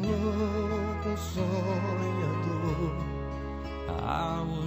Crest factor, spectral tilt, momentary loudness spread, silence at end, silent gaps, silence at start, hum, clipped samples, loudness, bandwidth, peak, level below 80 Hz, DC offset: 14 dB; -7 dB/octave; 7 LU; 0 s; none; 0 s; none; under 0.1%; -31 LUFS; 15.5 kHz; -16 dBFS; -40 dBFS; under 0.1%